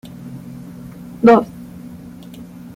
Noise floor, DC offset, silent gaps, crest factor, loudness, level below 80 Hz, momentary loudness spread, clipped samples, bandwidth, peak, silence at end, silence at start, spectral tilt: -36 dBFS; under 0.1%; none; 18 dB; -13 LUFS; -52 dBFS; 24 LU; under 0.1%; 16 kHz; -2 dBFS; 0.3 s; 0.25 s; -7.5 dB/octave